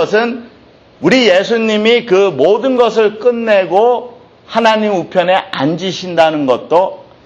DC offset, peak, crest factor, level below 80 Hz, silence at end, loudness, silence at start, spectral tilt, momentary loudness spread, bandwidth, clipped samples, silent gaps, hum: under 0.1%; 0 dBFS; 12 dB; -56 dBFS; 0.25 s; -12 LUFS; 0 s; -5 dB/octave; 7 LU; 8.2 kHz; under 0.1%; none; none